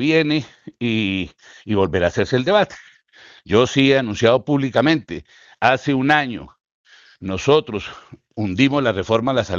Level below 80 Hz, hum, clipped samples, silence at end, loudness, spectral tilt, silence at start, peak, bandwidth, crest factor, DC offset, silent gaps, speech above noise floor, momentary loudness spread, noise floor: -52 dBFS; none; under 0.1%; 0 s; -18 LUFS; -6 dB/octave; 0 s; 0 dBFS; 7.6 kHz; 18 dB; under 0.1%; 6.74-6.84 s; 30 dB; 16 LU; -48 dBFS